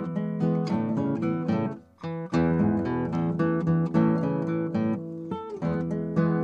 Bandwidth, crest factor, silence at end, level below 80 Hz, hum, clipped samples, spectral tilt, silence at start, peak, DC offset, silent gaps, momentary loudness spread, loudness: 6.8 kHz; 14 dB; 0 s; -54 dBFS; none; under 0.1%; -9.5 dB/octave; 0 s; -10 dBFS; under 0.1%; none; 10 LU; -27 LUFS